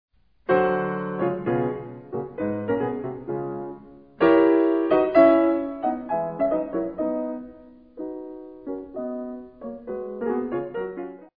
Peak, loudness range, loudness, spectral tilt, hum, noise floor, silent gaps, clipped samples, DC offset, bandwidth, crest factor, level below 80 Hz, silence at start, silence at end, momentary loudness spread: -4 dBFS; 12 LU; -24 LUFS; -10.5 dB/octave; none; -47 dBFS; none; under 0.1%; under 0.1%; 5 kHz; 20 dB; -58 dBFS; 0.5 s; 0.1 s; 19 LU